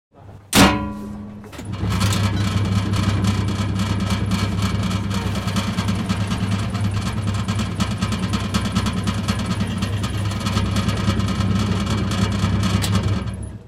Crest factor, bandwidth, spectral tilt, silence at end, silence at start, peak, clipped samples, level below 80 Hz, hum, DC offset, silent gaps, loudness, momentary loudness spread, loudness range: 18 dB; 16 kHz; -5.5 dB/octave; 0 s; 0.15 s; -2 dBFS; under 0.1%; -32 dBFS; none; under 0.1%; none; -21 LUFS; 4 LU; 2 LU